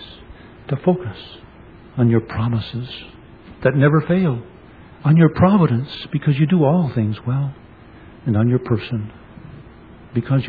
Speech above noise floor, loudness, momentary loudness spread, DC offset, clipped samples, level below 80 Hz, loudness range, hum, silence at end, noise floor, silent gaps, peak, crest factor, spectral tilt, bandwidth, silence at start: 25 dB; -19 LUFS; 20 LU; under 0.1%; under 0.1%; -46 dBFS; 6 LU; none; 0 s; -42 dBFS; none; 0 dBFS; 18 dB; -11 dB/octave; 4.9 kHz; 0 s